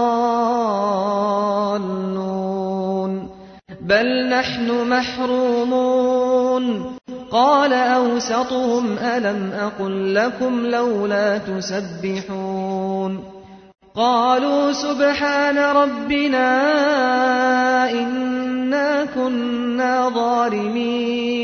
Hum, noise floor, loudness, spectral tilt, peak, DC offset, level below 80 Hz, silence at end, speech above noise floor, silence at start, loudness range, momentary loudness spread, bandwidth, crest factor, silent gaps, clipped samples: none; -40 dBFS; -19 LUFS; -5 dB/octave; -4 dBFS; under 0.1%; -56 dBFS; 0 s; 22 dB; 0 s; 5 LU; 8 LU; 6.6 kHz; 16 dB; none; under 0.1%